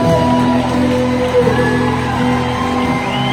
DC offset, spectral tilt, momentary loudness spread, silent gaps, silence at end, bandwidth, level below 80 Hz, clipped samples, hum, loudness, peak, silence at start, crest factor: under 0.1%; -6.5 dB/octave; 4 LU; none; 0 s; 14 kHz; -34 dBFS; under 0.1%; none; -14 LUFS; -2 dBFS; 0 s; 12 dB